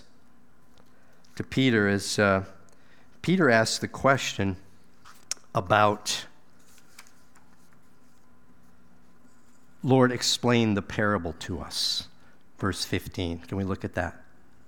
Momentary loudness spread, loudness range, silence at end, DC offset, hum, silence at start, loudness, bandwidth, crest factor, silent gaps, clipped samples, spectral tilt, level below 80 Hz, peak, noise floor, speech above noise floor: 13 LU; 6 LU; 0.55 s; 0.5%; none; 1.35 s; -26 LUFS; 18 kHz; 24 dB; none; under 0.1%; -4.5 dB/octave; -54 dBFS; -4 dBFS; -61 dBFS; 36 dB